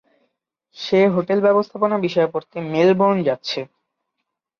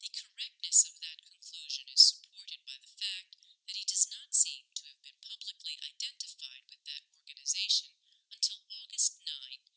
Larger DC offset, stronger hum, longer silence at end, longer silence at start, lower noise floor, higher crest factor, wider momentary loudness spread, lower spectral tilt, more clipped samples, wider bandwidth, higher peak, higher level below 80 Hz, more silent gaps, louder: neither; neither; first, 0.95 s vs 0.2 s; first, 0.75 s vs 0 s; first, -79 dBFS vs -61 dBFS; second, 16 dB vs 26 dB; second, 11 LU vs 22 LU; first, -7 dB/octave vs 12.5 dB/octave; neither; second, 6.8 kHz vs 8 kHz; first, -4 dBFS vs -8 dBFS; first, -64 dBFS vs under -90 dBFS; neither; first, -19 LUFS vs -29 LUFS